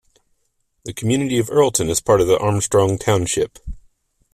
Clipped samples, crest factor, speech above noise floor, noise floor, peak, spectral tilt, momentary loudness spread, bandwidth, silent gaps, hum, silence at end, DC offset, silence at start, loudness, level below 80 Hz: under 0.1%; 16 dB; 50 dB; -68 dBFS; -2 dBFS; -5 dB/octave; 16 LU; 15.5 kHz; none; none; 0.55 s; under 0.1%; 0.85 s; -18 LUFS; -42 dBFS